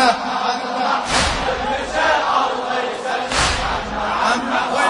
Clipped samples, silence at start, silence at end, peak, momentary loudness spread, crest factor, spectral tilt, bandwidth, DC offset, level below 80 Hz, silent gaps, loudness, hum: under 0.1%; 0 s; 0 s; -2 dBFS; 5 LU; 18 dB; -2.5 dB/octave; 11 kHz; under 0.1%; -36 dBFS; none; -19 LUFS; none